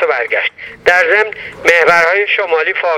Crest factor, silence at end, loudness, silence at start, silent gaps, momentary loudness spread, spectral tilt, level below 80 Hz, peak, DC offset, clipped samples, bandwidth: 12 dB; 0 s; -11 LUFS; 0 s; none; 8 LU; -2.5 dB/octave; -52 dBFS; 0 dBFS; under 0.1%; 0.2%; 15.5 kHz